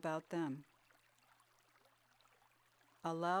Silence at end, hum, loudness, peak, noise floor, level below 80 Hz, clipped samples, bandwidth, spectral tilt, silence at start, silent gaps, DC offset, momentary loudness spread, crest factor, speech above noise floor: 0 s; none; -43 LUFS; -24 dBFS; -73 dBFS; -88 dBFS; under 0.1%; 17 kHz; -6 dB/octave; 0.05 s; none; under 0.1%; 9 LU; 20 dB; 33 dB